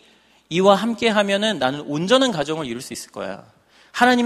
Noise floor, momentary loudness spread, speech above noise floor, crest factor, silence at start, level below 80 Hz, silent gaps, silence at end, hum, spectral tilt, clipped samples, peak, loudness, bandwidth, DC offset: -55 dBFS; 15 LU; 36 dB; 20 dB; 0.5 s; -60 dBFS; none; 0 s; none; -4.5 dB/octave; under 0.1%; 0 dBFS; -19 LUFS; 14.5 kHz; under 0.1%